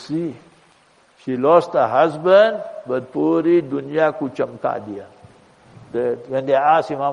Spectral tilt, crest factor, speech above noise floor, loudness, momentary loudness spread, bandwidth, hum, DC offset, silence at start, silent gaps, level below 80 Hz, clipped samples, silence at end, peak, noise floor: -7 dB/octave; 18 dB; 37 dB; -18 LUFS; 15 LU; 10.5 kHz; none; under 0.1%; 0 s; none; -66 dBFS; under 0.1%; 0 s; -2 dBFS; -55 dBFS